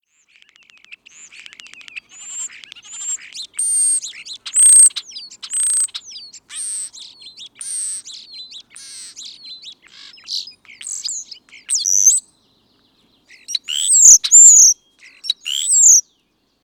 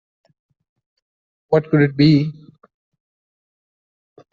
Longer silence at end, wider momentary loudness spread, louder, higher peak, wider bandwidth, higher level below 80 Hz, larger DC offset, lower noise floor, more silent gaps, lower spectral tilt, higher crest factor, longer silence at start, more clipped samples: second, 0.65 s vs 2 s; first, 28 LU vs 6 LU; first, -10 LUFS vs -16 LUFS; about the same, 0 dBFS vs -2 dBFS; first, 19.5 kHz vs 5.8 kHz; second, -70 dBFS vs -56 dBFS; neither; second, -64 dBFS vs under -90 dBFS; neither; second, 5.5 dB/octave vs -6.5 dB/octave; about the same, 18 dB vs 18 dB; first, 1.95 s vs 1.5 s; neither